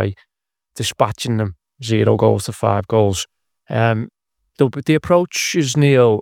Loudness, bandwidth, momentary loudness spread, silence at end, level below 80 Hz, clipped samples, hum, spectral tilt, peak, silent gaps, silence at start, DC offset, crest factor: -17 LUFS; 16.5 kHz; 11 LU; 0 s; -52 dBFS; under 0.1%; none; -5.5 dB/octave; 0 dBFS; none; 0 s; under 0.1%; 18 dB